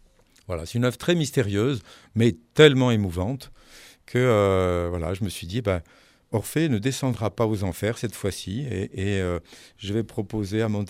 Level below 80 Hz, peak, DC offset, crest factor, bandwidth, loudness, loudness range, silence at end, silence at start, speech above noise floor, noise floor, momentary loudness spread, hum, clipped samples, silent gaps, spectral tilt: -48 dBFS; 0 dBFS; under 0.1%; 24 dB; 16 kHz; -24 LUFS; 6 LU; 0 s; 0.5 s; 26 dB; -50 dBFS; 11 LU; none; under 0.1%; none; -6 dB/octave